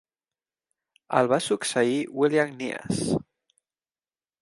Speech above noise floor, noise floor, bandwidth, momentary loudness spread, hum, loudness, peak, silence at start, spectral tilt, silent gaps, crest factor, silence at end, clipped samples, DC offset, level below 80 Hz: over 66 dB; under -90 dBFS; 11.5 kHz; 6 LU; none; -25 LUFS; -6 dBFS; 1.1 s; -4.5 dB/octave; none; 22 dB; 1.2 s; under 0.1%; under 0.1%; -62 dBFS